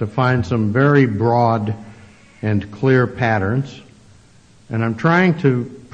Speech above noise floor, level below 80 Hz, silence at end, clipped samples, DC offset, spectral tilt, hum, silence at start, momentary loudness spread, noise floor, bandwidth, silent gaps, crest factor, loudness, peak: 32 dB; -52 dBFS; 0.15 s; under 0.1%; under 0.1%; -8.5 dB/octave; none; 0 s; 11 LU; -48 dBFS; 8 kHz; none; 16 dB; -17 LUFS; -2 dBFS